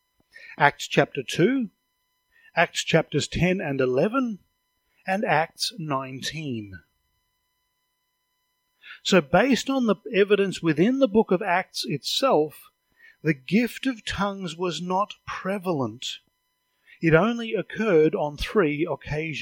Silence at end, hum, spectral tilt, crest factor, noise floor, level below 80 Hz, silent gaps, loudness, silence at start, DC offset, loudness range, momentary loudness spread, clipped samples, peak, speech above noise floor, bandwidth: 0 s; none; -5 dB/octave; 24 dB; -75 dBFS; -52 dBFS; none; -24 LUFS; 0.4 s; under 0.1%; 7 LU; 11 LU; under 0.1%; 0 dBFS; 52 dB; 17 kHz